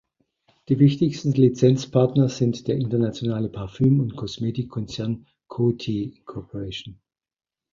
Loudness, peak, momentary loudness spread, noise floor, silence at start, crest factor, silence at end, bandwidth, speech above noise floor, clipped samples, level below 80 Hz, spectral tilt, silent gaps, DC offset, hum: -23 LUFS; -4 dBFS; 15 LU; -66 dBFS; 0.7 s; 18 dB; 0.8 s; 7.4 kHz; 44 dB; under 0.1%; -52 dBFS; -8 dB/octave; none; under 0.1%; none